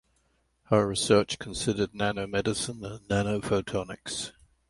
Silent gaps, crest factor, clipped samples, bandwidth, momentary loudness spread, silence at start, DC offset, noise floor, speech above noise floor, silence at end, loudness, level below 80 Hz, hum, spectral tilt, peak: none; 22 dB; under 0.1%; 11.5 kHz; 11 LU; 0.7 s; under 0.1%; -71 dBFS; 43 dB; 0.4 s; -28 LUFS; -52 dBFS; none; -4.5 dB/octave; -8 dBFS